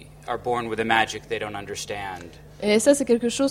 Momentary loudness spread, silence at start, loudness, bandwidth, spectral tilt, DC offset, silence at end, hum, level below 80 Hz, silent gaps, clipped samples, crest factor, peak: 14 LU; 0 s; -24 LUFS; 16 kHz; -3.5 dB/octave; under 0.1%; 0 s; none; -52 dBFS; none; under 0.1%; 20 dB; -4 dBFS